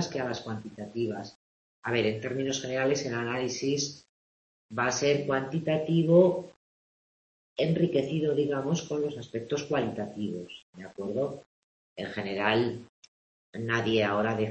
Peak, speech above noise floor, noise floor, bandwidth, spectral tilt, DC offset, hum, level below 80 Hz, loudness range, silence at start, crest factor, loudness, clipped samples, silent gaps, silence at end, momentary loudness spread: -8 dBFS; over 61 dB; under -90 dBFS; 8.4 kHz; -5 dB/octave; under 0.1%; none; -66 dBFS; 6 LU; 0 s; 22 dB; -29 LUFS; under 0.1%; 1.35-1.83 s, 4.09-4.69 s, 6.56-7.56 s, 10.63-10.73 s, 11.46-11.96 s, 12.89-13.02 s, 13.08-13.53 s; 0 s; 14 LU